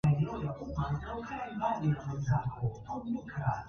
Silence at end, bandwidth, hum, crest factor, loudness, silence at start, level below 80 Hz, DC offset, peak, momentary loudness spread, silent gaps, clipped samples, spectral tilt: 0 s; 6.6 kHz; none; 16 dB; -35 LUFS; 0.05 s; -50 dBFS; under 0.1%; -18 dBFS; 7 LU; none; under 0.1%; -8.5 dB/octave